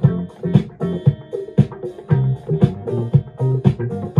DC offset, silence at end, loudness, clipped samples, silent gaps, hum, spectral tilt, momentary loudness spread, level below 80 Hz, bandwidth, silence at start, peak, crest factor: under 0.1%; 0 s; -19 LUFS; under 0.1%; none; none; -10.5 dB/octave; 6 LU; -44 dBFS; 4.2 kHz; 0 s; 0 dBFS; 18 dB